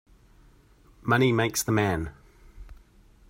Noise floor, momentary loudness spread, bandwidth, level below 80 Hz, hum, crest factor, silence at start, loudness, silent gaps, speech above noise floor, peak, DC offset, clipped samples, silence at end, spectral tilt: -57 dBFS; 13 LU; 16 kHz; -50 dBFS; none; 22 dB; 1.05 s; -25 LUFS; none; 33 dB; -8 dBFS; under 0.1%; under 0.1%; 0.55 s; -5 dB/octave